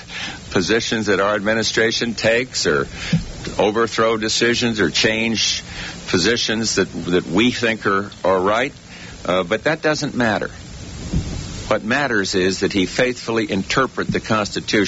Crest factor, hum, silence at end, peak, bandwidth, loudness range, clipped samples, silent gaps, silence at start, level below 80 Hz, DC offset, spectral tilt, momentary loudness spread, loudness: 16 dB; none; 0 s; -4 dBFS; 8.2 kHz; 3 LU; under 0.1%; none; 0 s; -40 dBFS; under 0.1%; -4 dB/octave; 9 LU; -19 LUFS